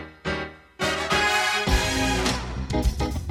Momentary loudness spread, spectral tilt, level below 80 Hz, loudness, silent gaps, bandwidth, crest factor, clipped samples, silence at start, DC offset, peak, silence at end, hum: 9 LU; -3.5 dB/octave; -32 dBFS; -24 LUFS; none; 16 kHz; 16 dB; under 0.1%; 0 s; under 0.1%; -8 dBFS; 0 s; none